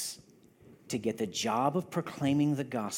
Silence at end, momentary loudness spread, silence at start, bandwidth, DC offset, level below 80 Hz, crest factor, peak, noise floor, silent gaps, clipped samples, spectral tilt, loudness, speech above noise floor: 0 s; 10 LU; 0 s; 17 kHz; under 0.1%; -74 dBFS; 18 dB; -14 dBFS; -59 dBFS; none; under 0.1%; -5 dB/octave; -32 LUFS; 28 dB